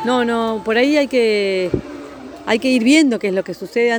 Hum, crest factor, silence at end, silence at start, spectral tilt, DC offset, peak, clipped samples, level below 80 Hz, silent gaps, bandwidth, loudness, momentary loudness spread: none; 14 dB; 0 s; 0 s; -4.5 dB/octave; under 0.1%; -2 dBFS; under 0.1%; -48 dBFS; none; over 20 kHz; -16 LUFS; 15 LU